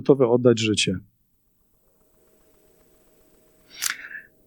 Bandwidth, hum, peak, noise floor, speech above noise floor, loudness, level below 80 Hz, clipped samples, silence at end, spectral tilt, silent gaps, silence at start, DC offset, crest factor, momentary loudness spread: 19 kHz; none; -2 dBFS; -66 dBFS; 47 dB; -22 LUFS; -64 dBFS; under 0.1%; 0.25 s; -4.5 dB/octave; none; 0 s; under 0.1%; 22 dB; 16 LU